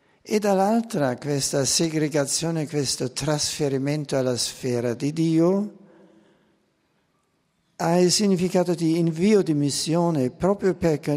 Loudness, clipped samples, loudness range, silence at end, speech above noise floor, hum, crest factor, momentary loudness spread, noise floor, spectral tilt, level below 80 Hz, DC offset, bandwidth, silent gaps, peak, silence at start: -23 LUFS; under 0.1%; 5 LU; 0 s; 47 dB; none; 16 dB; 6 LU; -69 dBFS; -5 dB/octave; -56 dBFS; under 0.1%; 16 kHz; none; -6 dBFS; 0.25 s